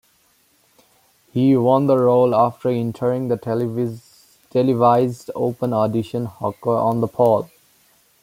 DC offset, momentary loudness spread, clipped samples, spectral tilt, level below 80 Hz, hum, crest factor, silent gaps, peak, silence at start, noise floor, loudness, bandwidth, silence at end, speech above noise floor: under 0.1%; 10 LU; under 0.1%; -8.5 dB/octave; -62 dBFS; none; 16 dB; none; -2 dBFS; 1.35 s; -60 dBFS; -19 LUFS; 16 kHz; 0.75 s; 42 dB